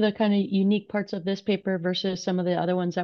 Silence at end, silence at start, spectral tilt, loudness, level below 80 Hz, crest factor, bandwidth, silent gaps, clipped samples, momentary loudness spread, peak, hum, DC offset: 0 s; 0 s; -6.5 dB/octave; -26 LUFS; -70 dBFS; 14 dB; 6.8 kHz; none; under 0.1%; 6 LU; -12 dBFS; none; under 0.1%